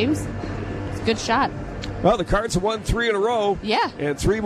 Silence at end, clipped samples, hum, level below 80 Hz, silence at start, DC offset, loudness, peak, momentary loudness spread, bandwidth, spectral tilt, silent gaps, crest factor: 0 s; under 0.1%; none; -34 dBFS; 0 s; under 0.1%; -23 LUFS; -4 dBFS; 9 LU; 14 kHz; -5 dB/octave; none; 18 dB